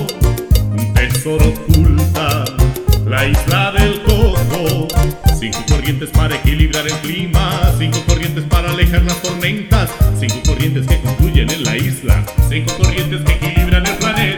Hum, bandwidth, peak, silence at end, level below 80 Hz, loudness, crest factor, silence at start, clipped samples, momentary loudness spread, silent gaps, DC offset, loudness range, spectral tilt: none; 19.5 kHz; 0 dBFS; 0 s; -16 dBFS; -15 LUFS; 12 dB; 0 s; under 0.1%; 3 LU; none; under 0.1%; 2 LU; -5 dB/octave